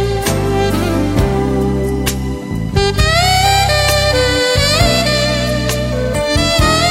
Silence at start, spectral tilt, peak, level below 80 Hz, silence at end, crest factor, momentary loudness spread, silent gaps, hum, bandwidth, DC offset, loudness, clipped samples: 0 s; -4 dB/octave; 0 dBFS; -22 dBFS; 0 s; 14 dB; 6 LU; none; none; 16.5 kHz; under 0.1%; -13 LUFS; under 0.1%